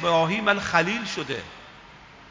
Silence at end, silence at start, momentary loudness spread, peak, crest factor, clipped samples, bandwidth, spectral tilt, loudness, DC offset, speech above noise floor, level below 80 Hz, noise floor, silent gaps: 0 s; 0 s; 16 LU; -4 dBFS; 22 dB; under 0.1%; 7.6 kHz; -4.5 dB/octave; -24 LUFS; under 0.1%; 24 dB; -56 dBFS; -48 dBFS; none